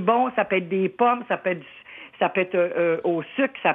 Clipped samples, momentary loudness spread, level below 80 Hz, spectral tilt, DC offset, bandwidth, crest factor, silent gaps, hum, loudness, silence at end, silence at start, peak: under 0.1%; 10 LU; -74 dBFS; -9 dB/octave; under 0.1%; 3.9 kHz; 16 dB; none; none; -23 LUFS; 0 s; 0 s; -6 dBFS